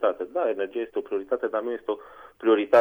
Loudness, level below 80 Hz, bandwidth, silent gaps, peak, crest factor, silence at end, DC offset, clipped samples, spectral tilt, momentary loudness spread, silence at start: -27 LUFS; -70 dBFS; over 20 kHz; none; -8 dBFS; 18 dB; 0 s; under 0.1%; under 0.1%; -6 dB/octave; 8 LU; 0 s